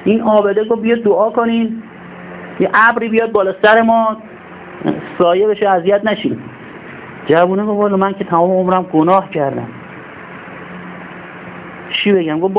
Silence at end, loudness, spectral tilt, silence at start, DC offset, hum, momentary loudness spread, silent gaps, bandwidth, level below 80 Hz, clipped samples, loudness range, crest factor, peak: 0 s; -13 LUFS; -10 dB/octave; 0 s; under 0.1%; none; 21 LU; none; 4 kHz; -54 dBFS; under 0.1%; 5 LU; 14 dB; 0 dBFS